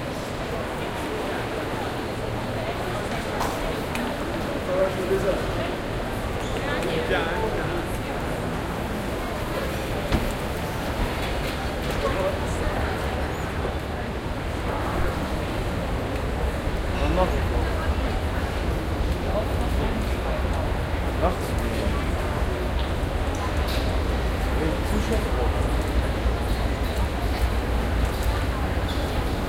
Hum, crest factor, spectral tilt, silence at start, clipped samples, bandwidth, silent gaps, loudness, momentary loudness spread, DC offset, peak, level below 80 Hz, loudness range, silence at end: none; 16 dB; -6 dB/octave; 0 s; under 0.1%; 16.5 kHz; none; -26 LUFS; 4 LU; under 0.1%; -8 dBFS; -30 dBFS; 2 LU; 0 s